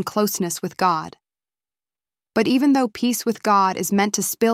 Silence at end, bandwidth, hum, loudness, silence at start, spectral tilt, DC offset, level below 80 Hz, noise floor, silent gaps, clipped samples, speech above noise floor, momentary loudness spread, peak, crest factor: 0 s; over 20 kHz; none; -20 LUFS; 0 s; -4 dB/octave; under 0.1%; -64 dBFS; under -90 dBFS; none; under 0.1%; over 70 dB; 8 LU; -4 dBFS; 16 dB